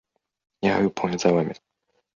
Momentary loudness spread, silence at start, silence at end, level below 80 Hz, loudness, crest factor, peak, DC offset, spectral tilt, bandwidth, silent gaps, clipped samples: 9 LU; 0.6 s; 0.6 s; -58 dBFS; -23 LUFS; 20 dB; -4 dBFS; under 0.1%; -6 dB/octave; 7.4 kHz; none; under 0.1%